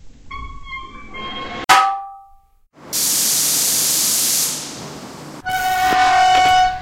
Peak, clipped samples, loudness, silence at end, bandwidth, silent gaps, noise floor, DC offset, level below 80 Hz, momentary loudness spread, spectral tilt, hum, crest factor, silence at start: 0 dBFS; under 0.1%; -15 LUFS; 0 s; 16.5 kHz; none; -50 dBFS; under 0.1%; -42 dBFS; 21 LU; 0 dB/octave; none; 18 dB; 0.05 s